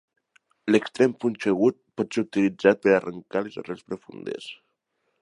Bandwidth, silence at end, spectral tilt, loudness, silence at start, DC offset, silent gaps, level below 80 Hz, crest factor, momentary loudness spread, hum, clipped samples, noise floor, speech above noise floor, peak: 10.5 kHz; 0.65 s; -6 dB/octave; -24 LUFS; 0.65 s; under 0.1%; none; -68 dBFS; 22 dB; 15 LU; none; under 0.1%; -75 dBFS; 51 dB; -4 dBFS